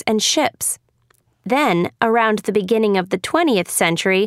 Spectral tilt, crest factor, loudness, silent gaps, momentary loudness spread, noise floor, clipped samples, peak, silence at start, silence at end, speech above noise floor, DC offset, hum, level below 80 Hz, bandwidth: -3.5 dB/octave; 18 dB; -18 LUFS; none; 6 LU; -60 dBFS; under 0.1%; -2 dBFS; 0.05 s; 0 s; 43 dB; under 0.1%; none; -62 dBFS; 16 kHz